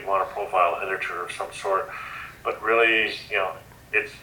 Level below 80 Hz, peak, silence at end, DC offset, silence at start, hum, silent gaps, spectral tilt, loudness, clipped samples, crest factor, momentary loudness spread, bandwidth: -58 dBFS; -6 dBFS; 0 s; under 0.1%; 0 s; none; none; -3 dB/octave; -24 LUFS; under 0.1%; 20 dB; 13 LU; 19 kHz